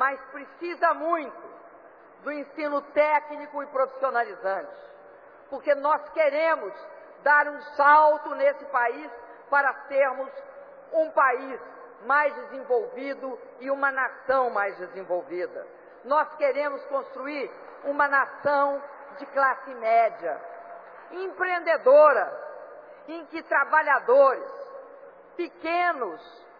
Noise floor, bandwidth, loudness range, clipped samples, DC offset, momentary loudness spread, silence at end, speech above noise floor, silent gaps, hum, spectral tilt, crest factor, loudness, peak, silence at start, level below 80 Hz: -50 dBFS; 5.2 kHz; 6 LU; under 0.1%; under 0.1%; 21 LU; 0.3 s; 26 dB; none; none; -6 dB/octave; 18 dB; -24 LUFS; -6 dBFS; 0 s; -76 dBFS